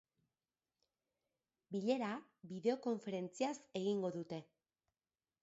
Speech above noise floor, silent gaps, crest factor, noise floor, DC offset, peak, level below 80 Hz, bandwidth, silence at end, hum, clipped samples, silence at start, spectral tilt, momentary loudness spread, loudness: over 49 dB; none; 20 dB; under -90 dBFS; under 0.1%; -24 dBFS; -88 dBFS; 7.6 kHz; 1 s; none; under 0.1%; 1.7 s; -5.5 dB/octave; 11 LU; -42 LUFS